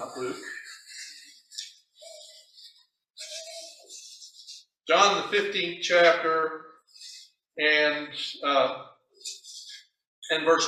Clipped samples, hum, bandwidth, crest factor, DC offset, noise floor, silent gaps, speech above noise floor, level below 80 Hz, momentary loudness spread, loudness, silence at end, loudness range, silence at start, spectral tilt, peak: under 0.1%; none; 13.5 kHz; 24 dB; under 0.1%; -61 dBFS; 10.07-10.22 s; 37 dB; -80 dBFS; 25 LU; -25 LUFS; 0 s; 18 LU; 0 s; -1.5 dB/octave; -4 dBFS